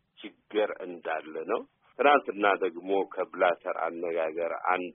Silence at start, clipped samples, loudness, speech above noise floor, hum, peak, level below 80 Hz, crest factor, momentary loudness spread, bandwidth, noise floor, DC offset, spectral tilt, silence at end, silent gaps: 0.2 s; under 0.1%; -29 LUFS; 20 dB; none; -8 dBFS; -78 dBFS; 20 dB; 11 LU; 3.9 kHz; -49 dBFS; under 0.1%; 2 dB/octave; 0 s; none